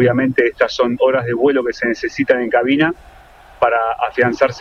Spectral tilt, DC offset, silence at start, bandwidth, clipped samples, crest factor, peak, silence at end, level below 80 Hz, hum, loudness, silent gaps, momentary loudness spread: -6.5 dB/octave; under 0.1%; 0 s; 7.2 kHz; under 0.1%; 16 dB; 0 dBFS; 0 s; -48 dBFS; none; -16 LUFS; none; 5 LU